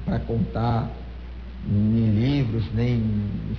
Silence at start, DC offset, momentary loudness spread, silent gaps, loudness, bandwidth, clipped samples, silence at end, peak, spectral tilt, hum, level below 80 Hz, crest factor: 0 s; 0.4%; 17 LU; none; -24 LUFS; 6 kHz; under 0.1%; 0 s; -14 dBFS; -10 dB/octave; none; -36 dBFS; 10 dB